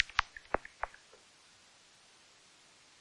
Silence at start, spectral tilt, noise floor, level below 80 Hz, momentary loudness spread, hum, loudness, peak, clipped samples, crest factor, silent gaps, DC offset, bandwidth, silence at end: 0 s; -2.5 dB/octave; -62 dBFS; -58 dBFS; 23 LU; none; -38 LUFS; -14 dBFS; under 0.1%; 28 dB; none; under 0.1%; 11.5 kHz; 2.1 s